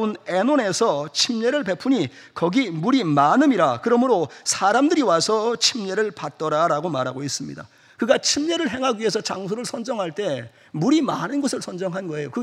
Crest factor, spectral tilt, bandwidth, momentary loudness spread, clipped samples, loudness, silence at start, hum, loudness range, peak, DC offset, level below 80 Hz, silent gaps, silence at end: 20 dB; -4 dB/octave; 13.5 kHz; 10 LU; under 0.1%; -21 LUFS; 0 s; none; 5 LU; -2 dBFS; under 0.1%; -68 dBFS; none; 0 s